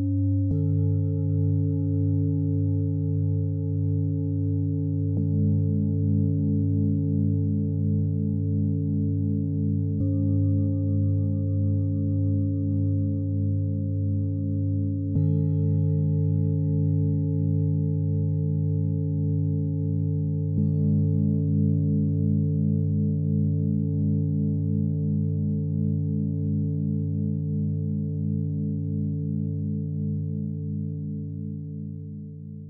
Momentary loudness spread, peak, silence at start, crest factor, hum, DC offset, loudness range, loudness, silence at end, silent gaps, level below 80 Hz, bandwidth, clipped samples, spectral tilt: 5 LU; -12 dBFS; 0 s; 12 dB; 50 Hz at -45 dBFS; under 0.1%; 3 LU; -25 LUFS; 0 s; none; -58 dBFS; 0.9 kHz; under 0.1%; -16.5 dB/octave